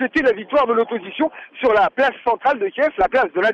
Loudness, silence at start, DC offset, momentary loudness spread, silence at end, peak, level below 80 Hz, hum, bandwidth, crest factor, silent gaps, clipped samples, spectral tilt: -19 LUFS; 0 s; under 0.1%; 7 LU; 0 s; -8 dBFS; -50 dBFS; none; 8 kHz; 12 dB; none; under 0.1%; -5.5 dB/octave